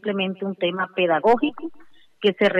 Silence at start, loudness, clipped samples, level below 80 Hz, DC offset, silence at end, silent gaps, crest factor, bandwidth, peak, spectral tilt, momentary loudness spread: 0.05 s; -22 LUFS; under 0.1%; -62 dBFS; under 0.1%; 0 s; none; 14 dB; 8.4 kHz; -8 dBFS; -7 dB/octave; 9 LU